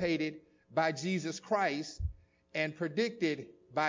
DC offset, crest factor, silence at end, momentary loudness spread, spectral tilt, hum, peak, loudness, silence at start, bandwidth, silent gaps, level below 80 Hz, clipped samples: under 0.1%; 18 dB; 0 s; 10 LU; -5 dB/octave; none; -16 dBFS; -35 LUFS; 0 s; 7.6 kHz; none; -50 dBFS; under 0.1%